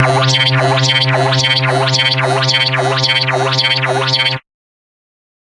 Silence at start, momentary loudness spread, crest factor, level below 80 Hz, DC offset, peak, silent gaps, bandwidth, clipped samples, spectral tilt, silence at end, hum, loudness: 0 s; 2 LU; 14 dB; -52 dBFS; under 0.1%; 0 dBFS; none; 11.5 kHz; under 0.1%; -4 dB/octave; 1.05 s; none; -12 LUFS